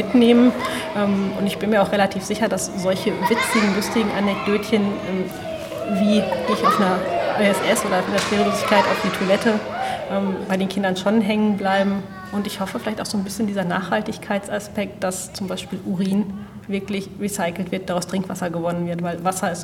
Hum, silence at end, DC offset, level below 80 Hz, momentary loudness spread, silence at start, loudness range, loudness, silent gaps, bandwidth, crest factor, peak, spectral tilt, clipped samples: none; 0 s; under 0.1%; -52 dBFS; 10 LU; 0 s; 6 LU; -21 LUFS; none; 16.5 kHz; 20 dB; -2 dBFS; -5 dB/octave; under 0.1%